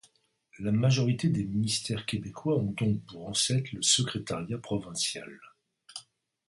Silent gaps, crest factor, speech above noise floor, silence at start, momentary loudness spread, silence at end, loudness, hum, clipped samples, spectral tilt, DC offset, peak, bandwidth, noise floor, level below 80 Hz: none; 20 dB; 36 dB; 0.55 s; 15 LU; 0.45 s; -29 LUFS; none; under 0.1%; -4 dB/octave; under 0.1%; -10 dBFS; 11.5 kHz; -66 dBFS; -60 dBFS